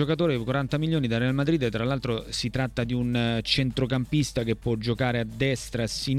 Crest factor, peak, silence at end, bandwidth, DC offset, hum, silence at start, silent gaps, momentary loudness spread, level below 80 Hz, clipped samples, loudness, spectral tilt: 16 dB; -10 dBFS; 0 s; 14 kHz; under 0.1%; none; 0 s; none; 4 LU; -44 dBFS; under 0.1%; -26 LUFS; -5.5 dB/octave